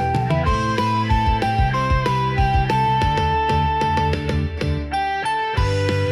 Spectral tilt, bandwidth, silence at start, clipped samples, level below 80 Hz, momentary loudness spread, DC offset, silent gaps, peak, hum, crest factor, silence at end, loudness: -6.5 dB/octave; 12.5 kHz; 0 s; under 0.1%; -28 dBFS; 4 LU; under 0.1%; none; -6 dBFS; none; 12 dB; 0 s; -20 LUFS